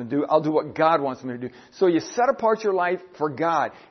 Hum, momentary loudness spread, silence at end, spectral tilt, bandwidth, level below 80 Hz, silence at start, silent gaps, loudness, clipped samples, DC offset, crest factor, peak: none; 10 LU; 0.1 s; -6 dB/octave; 6.4 kHz; -70 dBFS; 0 s; none; -23 LUFS; under 0.1%; under 0.1%; 18 dB; -6 dBFS